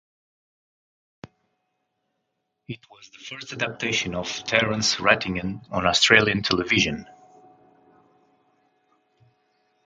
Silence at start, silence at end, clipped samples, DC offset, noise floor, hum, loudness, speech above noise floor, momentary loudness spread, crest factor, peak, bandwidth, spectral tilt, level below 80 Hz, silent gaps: 2.7 s; 2.8 s; under 0.1%; under 0.1%; -78 dBFS; none; -21 LUFS; 54 dB; 23 LU; 26 dB; 0 dBFS; 9.6 kHz; -3 dB/octave; -52 dBFS; none